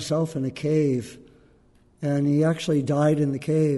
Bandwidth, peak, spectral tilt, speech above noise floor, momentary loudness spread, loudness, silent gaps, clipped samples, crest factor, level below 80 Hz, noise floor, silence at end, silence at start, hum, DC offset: 11.5 kHz; -10 dBFS; -7 dB/octave; 35 dB; 7 LU; -24 LUFS; none; under 0.1%; 14 dB; -60 dBFS; -58 dBFS; 0 s; 0 s; none; under 0.1%